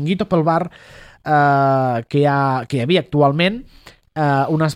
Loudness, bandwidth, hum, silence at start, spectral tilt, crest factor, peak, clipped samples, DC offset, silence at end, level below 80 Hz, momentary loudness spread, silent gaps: -17 LUFS; 11 kHz; none; 0 s; -7.5 dB/octave; 14 dB; -2 dBFS; under 0.1%; under 0.1%; 0 s; -50 dBFS; 8 LU; none